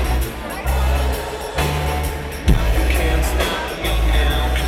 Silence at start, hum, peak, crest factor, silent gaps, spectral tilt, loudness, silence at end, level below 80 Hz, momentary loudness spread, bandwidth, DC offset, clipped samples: 0 s; none; 0 dBFS; 18 dB; none; -5 dB/octave; -20 LUFS; 0 s; -20 dBFS; 6 LU; 16.5 kHz; under 0.1%; under 0.1%